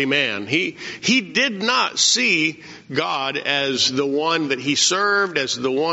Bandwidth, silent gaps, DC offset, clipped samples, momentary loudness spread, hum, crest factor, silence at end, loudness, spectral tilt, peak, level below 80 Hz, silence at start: 8 kHz; none; under 0.1%; under 0.1%; 7 LU; none; 16 dB; 0 s; -19 LUFS; -1 dB/octave; -4 dBFS; -66 dBFS; 0 s